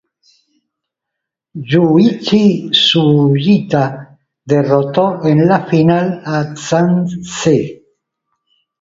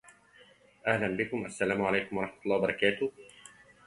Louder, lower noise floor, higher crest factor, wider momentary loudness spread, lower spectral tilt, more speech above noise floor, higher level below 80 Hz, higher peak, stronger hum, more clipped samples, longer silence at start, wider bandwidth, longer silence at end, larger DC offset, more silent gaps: first, -13 LUFS vs -31 LUFS; first, -79 dBFS vs -60 dBFS; second, 14 dB vs 22 dB; about the same, 9 LU vs 8 LU; about the same, -6 dB/octave vs -5 dB/octave; first, 67 dB vs 29 dB; first, -52 dBFS vs -64 dBFS; first, 0 dBFS vs -10 dBFS; neither; neither; first, 1.55 s vs 0.85 s; second, 7.8 kHz vs 11.5 kHz; first, 1.05 s vs 0.4 s; neither; neither